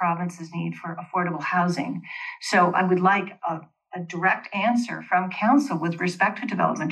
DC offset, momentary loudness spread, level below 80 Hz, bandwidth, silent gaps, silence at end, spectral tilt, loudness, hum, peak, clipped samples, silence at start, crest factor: under 0.1%; 12 LU; -84 dBFS; 12 kHz; none; 0 s; -6 dB/octave; -24 LUFS; none; -6 dBFS; under 0.1%; 0 s; 18 dB